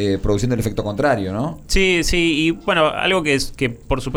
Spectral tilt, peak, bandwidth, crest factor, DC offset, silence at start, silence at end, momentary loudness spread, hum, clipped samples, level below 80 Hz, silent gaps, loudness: -4.5 dB/octave; -4 dBFS; over 20 kHz; 14 dB; under 0.1%; 0 s; 0 s; 7 LU; none; under 0.1%; -30 dBFS; none; -18 LUFS